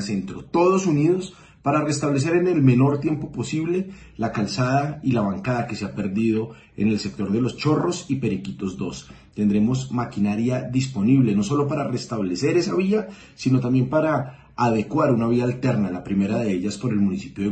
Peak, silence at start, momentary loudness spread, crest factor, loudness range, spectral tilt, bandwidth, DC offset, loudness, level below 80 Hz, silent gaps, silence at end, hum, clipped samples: -6 dBFS; 0 s; 9 LU; 16 dB; 3 LU; -7 dB/octave; 8.8 kHz; under 0.1%; -22 LUFS; -52 dBFS; none; 0 s; none; under 0.1%